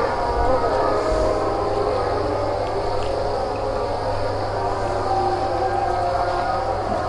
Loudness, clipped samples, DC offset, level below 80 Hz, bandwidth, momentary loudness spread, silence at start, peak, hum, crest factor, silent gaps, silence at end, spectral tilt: -22 LUFS; under 0.1%; under 0.1%; -34 dBFS; 11.5 kHz; 4 LU; 0 s; -6 dBFS; none; 16 dB; none; 0 s; -6 dB/octave